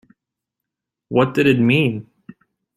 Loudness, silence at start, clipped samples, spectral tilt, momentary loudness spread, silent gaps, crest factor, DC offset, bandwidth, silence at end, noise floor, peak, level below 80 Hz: -17 LUFS; 1.1 s; under 0.1%; -7.5 dB/octave; 7 LU; none; 18 dB; under 0.1%; 13.5 kHz; 0.75 s; -83 dBFS; -2 dBFS; -58 dBFS